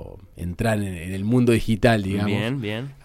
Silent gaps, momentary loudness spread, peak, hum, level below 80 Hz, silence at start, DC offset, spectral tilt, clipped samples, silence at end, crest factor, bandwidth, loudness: none; 12 LU; -6 dBFS; none; -40 dBFS; 0 s; under 0.1%; -6.5 dB/octave; under 0.1%; 0.1 s; 16 dB; 15.5 kHz; -22 LUFS